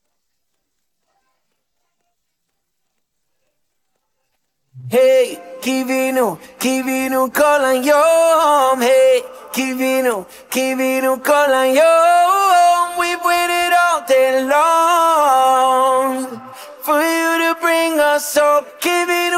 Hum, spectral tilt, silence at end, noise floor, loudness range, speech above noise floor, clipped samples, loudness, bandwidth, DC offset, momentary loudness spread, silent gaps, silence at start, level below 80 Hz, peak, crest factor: none; -2.5 dB/octave; 0 s; -74 dBFS; 6 LU; 60 dB; under 0.1%; -14 LUFS; 16.5 kHz; under 0.1%; 9 LU; none; 4.75 s; -62 dBFS; -2 dBFS; 14 dB